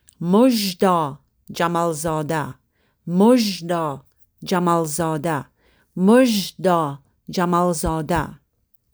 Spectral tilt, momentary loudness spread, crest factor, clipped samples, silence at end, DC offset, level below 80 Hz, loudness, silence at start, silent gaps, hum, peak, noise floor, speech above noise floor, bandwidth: -5.5 dB/octave; 15 LU; 18 dB; under 0.1%; 0.6 s; under 0.1%; -46 dBFS; -20 LUFS; 0.2 s; none; none; -4 dBFS; -63 dBFS; 44 dB; over 20 kHz